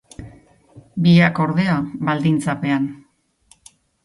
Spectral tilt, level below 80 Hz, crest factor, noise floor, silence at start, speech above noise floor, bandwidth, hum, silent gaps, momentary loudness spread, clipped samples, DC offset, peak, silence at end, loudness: -7 dB/octave; -52 dBFS; 18 dB; -56 dBFS; 0.2 s; 39 dB; 11.5 kHz; none; none; 17 LU; under 0.1%; under 0.1%; -2 dBFS; 1.1 s; -18 LUFS